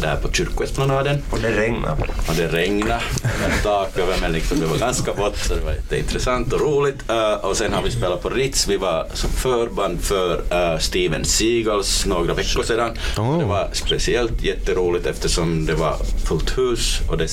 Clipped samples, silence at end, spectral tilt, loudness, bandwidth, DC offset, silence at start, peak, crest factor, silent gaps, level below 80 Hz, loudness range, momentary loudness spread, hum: under 0.1%; 0 s; -4 dB/octave; -21 LUFS; 16.5 kHz; under 0.1%; 0 s; -4 dBFS; 16 dB; none; -26 dBFS; 2 LU; 4 LU; none